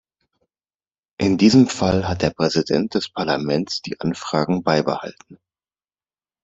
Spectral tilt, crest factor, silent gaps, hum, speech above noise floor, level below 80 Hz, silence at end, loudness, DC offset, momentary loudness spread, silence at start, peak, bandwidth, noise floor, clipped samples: -5.5 dB/octave; 20 dB; none; none; over 71 dB; -52 dBFS; 1.1 s; -20 LUFS; under 0.1%; 11 LU; 1.2 s; -2 dBFS; 8 kHz; under -90 dBFS; under 0.1%